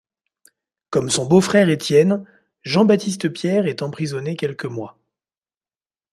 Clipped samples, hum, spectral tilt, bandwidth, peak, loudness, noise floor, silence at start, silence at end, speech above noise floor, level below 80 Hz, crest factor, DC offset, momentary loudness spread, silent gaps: under 0.1%; none; -5.5 dB/octave; 13.5 kHz; -2 dBFS; -19 LUFS; under -90 dBFS; 0.9 s; 1.2 s; over 72 dB; -62 dBFS; 18 dB; under 0.1%; 13 LU; none